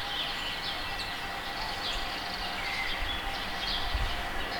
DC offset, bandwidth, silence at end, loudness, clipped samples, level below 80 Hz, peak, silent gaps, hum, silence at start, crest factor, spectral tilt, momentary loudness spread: under 0.1%; 19 kHz; 0 s; -32 LUFS; under 0.1%; -40 dBFS; -18 dBFS; none; none; 0 s; 14 dB; -2.5 dB/octave; 3 LU